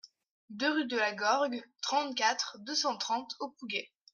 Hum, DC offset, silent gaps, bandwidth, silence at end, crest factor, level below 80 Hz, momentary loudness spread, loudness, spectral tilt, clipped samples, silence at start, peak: none; under 0.1%; 0.31-0.48 s; 11 kHz; 0.3 s; 18 dB; -88 dBFS; 8 LU; -32 LUFS; -1.5 dB/octave; under 0.1%; 0.05 s; -16 dBFS